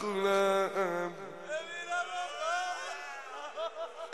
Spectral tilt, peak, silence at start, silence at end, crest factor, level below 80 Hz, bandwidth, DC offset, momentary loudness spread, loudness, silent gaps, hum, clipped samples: -3.5 dB/octave; -18 dBFS; 0 s; 0 s; 16 dB; -82 dBFS; 13 kHz; 0.1%; 14 LU; -34 LUFS; none; none; under 0.1%